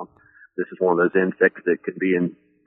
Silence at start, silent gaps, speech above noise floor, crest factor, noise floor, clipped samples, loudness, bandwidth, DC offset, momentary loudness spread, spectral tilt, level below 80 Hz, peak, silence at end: 0 s; none; 32 dB; 20 dB; -53 dBFS; under 0.1%; -22 LUFS; 3.5 kHz; under 0.1%; 12 LU; -6.5 dB/octave; -70 dBFS; -4 dBFS; 0.35 s